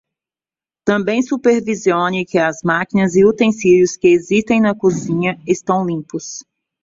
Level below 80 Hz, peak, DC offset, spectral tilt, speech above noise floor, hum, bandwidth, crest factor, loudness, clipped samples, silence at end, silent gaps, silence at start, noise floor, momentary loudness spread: -54 dBFS; -2 dBFS; under 0.1%; -5.5 dB/octave; over 75 dB; none; 7.8 kHz; 14 dB; -15 LUFS; under 0.1%; 0.4 s; none; 0.85 s; under -90 dBFS; 10 LU